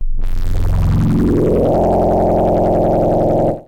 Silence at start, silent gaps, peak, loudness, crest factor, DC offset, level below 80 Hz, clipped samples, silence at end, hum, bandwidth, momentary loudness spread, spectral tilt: 0 s; none; -6 dBFS; -15 LUFS; 8 dB; under 0.1%; -20 dBFS; under 0.1%; 0.05 s; none; 9.4 kHz; 7 LU; -9.5 dB/octave